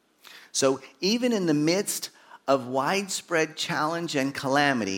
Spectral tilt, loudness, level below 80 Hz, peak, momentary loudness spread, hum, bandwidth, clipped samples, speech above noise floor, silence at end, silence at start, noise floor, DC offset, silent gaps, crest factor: -3.5 dB/octave; -26 LUFS; -76 dBFS; -6 dBFS; 6 LU; none; 17.5 kHz; under 0.1%; 25 dB; 0 s; 0.3 s; -51 dBFS; under 0.1%; none; 20 dB